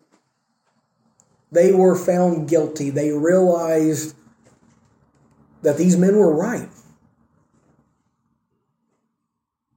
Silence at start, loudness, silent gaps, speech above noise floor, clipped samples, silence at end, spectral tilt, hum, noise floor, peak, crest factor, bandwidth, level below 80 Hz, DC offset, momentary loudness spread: 1.5 s; -18 LUFS; none; 62 dB; under 0.1%; 3.1 s; -7 dB/octave; none; -79 dBFS; -4 dBFS; 16 dB; 16.5 kHz; -66 dBFS; under 0.1%; 11 LU